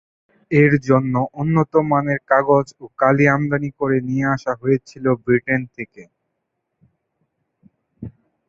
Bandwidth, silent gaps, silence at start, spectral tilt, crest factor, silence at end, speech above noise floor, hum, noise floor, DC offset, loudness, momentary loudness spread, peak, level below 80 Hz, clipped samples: 7.6 kHz; none; 0.5 s; -9 dB/octave; 18 dB; 0.4 s; 58 dB; none; -76 dBFS; under 0.1%; -18 LUFS; 17 LU; -2 dBFS; -54 dBFS; under 0.1%